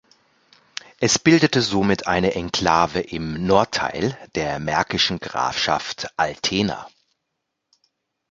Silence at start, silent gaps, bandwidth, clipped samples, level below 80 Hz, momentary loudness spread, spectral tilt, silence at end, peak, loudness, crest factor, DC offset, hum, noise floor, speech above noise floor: 1 s; none; 9.4 kHz; under 0.1%; -48 dBFS; 10 LU; -4 dB/octave; 1.4 s; 0 dBFS; -20 LUFS; 22 dB; under 0.1%; none; -78 dBFS; 58 dB